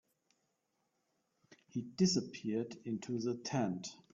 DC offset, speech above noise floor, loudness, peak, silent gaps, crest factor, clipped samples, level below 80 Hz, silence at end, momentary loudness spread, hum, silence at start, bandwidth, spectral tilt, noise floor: under 0.1%; 45 dB; -38 LUFS; -20 dBFS; none; 20 dB; under 0.1%; -74 dBFS; 0.15 s; 12 LU; none; 1.75 s; 7.6 kHz; -6 dB/octave; -83 dBFS